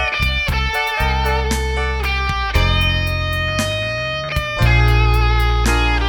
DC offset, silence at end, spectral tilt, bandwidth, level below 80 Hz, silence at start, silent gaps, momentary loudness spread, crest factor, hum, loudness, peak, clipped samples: under 0.1%; 0 s; -4.5 dB/octave; 18 kHz; -20 dBFS; 0 s; none; 6 LU; 14 dB; none; -17 LUFS; -2 dBFS; under 0.1%